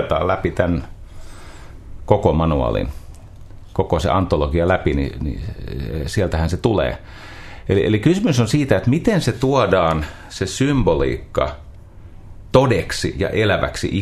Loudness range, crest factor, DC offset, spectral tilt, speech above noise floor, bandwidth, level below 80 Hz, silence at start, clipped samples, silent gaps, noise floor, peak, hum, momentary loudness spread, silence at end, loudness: 4 LU; 18 dB; under 0.1%; -6.5 dB/octave; 20 dB; 13.5 kHz; -32 dBFS; 0 s; under 0.1%; none; -38 dBFS; 0 dBFS; none; 13 LU; 0 s; -19 LUFS